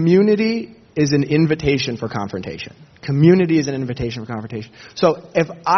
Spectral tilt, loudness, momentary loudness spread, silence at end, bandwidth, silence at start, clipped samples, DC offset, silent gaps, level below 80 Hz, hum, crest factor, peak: -6 dB/octave; -18 LUFS; 17 LU; 0 s; 6.4 kHz; 0 s; under 0.1%; under 0.1%; none; -46 dBFS; none; 18 dB; 0 dBFS